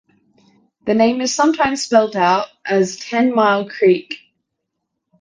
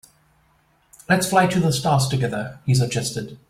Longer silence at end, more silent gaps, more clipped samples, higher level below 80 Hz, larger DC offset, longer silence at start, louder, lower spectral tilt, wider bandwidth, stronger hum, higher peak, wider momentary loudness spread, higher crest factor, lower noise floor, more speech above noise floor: first, 1.05 s vs 0.15 s; neither; neither; second, -58 dBFS vs -52 dBFS; neither; second, 0.85 s vs 1.1 s; first, -16 LUFS vs -20 LUFS; about the same, -4 dB/octave vs -5 dB/octave; second, 10 kHz vs 16 kHz; neither; first, 0 dBFS vs -4 dBFS; about the same, 6 LU vs 8 LU; about the same, 18 dB vs 18 dB; first, -76 dBFS vs -61 dBFS; first, 61 dB vs 41 dB